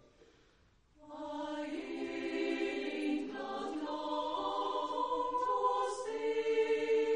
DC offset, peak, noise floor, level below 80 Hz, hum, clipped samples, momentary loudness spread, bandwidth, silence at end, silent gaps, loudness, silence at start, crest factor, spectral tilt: under 0.1%; -20 dBFS; -68 dBFS; -72 dBFS; none; under 0.1%; 8 LU; 10 kHz; 0 s; none; -36 LUFS; 0.25 s; 16 dB; -3.5 dB/octave